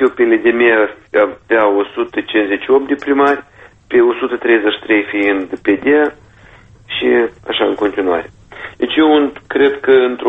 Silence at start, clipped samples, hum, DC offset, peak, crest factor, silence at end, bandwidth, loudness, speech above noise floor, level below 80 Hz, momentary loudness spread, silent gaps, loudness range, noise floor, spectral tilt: 0 s; under 0.1%; none; under 0.1%; 0 dBFS; 14 dB; 0 s; 4 kHz; -14 LUFS; 29 dB; -50 dBFS; 8 LU; none; 3 LU; -42 dBFS; -6 dB/octave